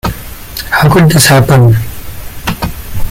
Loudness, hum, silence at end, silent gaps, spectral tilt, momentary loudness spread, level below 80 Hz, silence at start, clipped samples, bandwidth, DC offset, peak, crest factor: -8 LUFS; none; 0 s; none; -5 dB/octave; 18 LU; -24 dBFS; 0.05 s; 0.1%; 17 kHz; under 0.1%; 0 dBFS; 10 dB